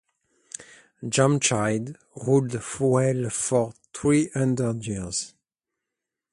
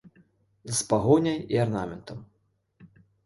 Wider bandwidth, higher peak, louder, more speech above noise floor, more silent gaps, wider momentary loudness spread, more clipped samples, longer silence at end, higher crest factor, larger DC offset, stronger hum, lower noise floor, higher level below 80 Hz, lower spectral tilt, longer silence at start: about the same, 11.5 kHz vs 12 kHz; about the same, -6 dBFS vs -8 dBFS; about the same, -24 LUFS vs -25 LUFS; first, 62 dB vs 42 dB; neither; second, 17 LU vs 22 LU; neither; first, 1.05 s vs 0.4 s; about the same, 20 dB vs 20 dB; neither; neither; first, -86 dBFS vs -68 dBFS; about the same, -56 dBFS vs -56 dBFS; about the same, -5 dB/octave vs -5.5 dB/octave; first, 0.6 s vs 0.05 s